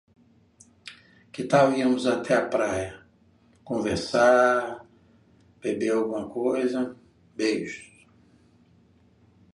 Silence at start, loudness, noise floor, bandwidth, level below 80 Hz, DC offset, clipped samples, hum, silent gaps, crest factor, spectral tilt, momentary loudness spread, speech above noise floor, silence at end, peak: 0.85 s; -25 LUFS; -60 dBFS; 11.5 kHz; -58 dBFS; under 0.1%; under 0.1%; none; none; 20 dB; -5 dB/octave; 22 LU; 36 dB; 1.7 s; -6 dBFS